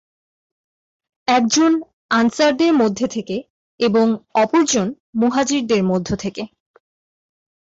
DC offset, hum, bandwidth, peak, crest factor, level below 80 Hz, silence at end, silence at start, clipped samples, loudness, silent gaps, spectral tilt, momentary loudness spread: under 0.1%; none; 8 kHz; -6 dBFS; 14 dB; -52 dBFS; 1.3 s; 1.3 s; under 0.1%; -18 LUFS; 1.93-2.09 s, 3.50-3.78 s, 5.00-5.13 s; -4 dB/octave; 11 LU